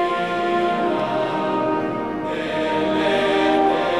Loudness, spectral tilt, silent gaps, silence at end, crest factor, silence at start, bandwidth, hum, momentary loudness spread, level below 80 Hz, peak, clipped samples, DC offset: -21 LUFS; -5.5 dB/octave; none; 0 s; 14 dB; 0 s; 12 kHz; none; 7 LU; -56 dBFS; -6 dBFS; under 0.1%; 0.3%